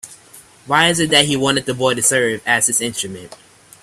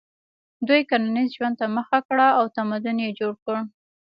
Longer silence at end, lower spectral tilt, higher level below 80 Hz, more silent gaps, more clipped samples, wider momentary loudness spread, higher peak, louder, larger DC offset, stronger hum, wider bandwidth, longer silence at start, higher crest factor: first, 0.5 s vs 0.35 s; second, -2 dB/octave vs -8 dB/octave; first, -54 dBFS vs -76 dBFS; second, none vs 2.05-2.09 s, 3.42-3.46 s; neither; about the same, 12 LU vs 10 LU; first, 0 dBFS vs -6 dBFS; first, -15 LUFS vs -23 LUFS; neither; neither; first, 16 kHz vs 5.4 kHz; second, 0.05 s vs 0.6 s; about the same, 18 dB vs 18 dB